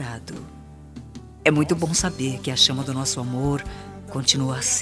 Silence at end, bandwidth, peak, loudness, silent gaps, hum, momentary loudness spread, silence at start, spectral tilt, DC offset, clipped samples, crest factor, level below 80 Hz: 0 s; 11 kHz; -2 dBFS; -22 LUFS; none; none; 22 LU; 0 s; -3.5 dB/octave; under 0.1%; under 0.1%; 22 dB; -44 dBFS